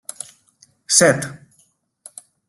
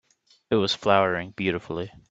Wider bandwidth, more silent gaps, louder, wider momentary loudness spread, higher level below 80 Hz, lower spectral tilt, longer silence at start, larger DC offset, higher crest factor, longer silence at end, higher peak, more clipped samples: first, 12.5 kHz vs 8 kHz; neither; first, -15 LUFS vs -25 LUFS; first, 26 LU vs 11 LU; about the same, -60 dBFS vs -60 dBFS; second, -2.5 dB/octave vs -5.5 dB/octave; first, 0.9 s vs 0.5 s; neither; about the same, 22 dB vs 22 dB; first, 1.15 s vs 0.2 s; first, 0 dBFS vs -4 dBFS; neither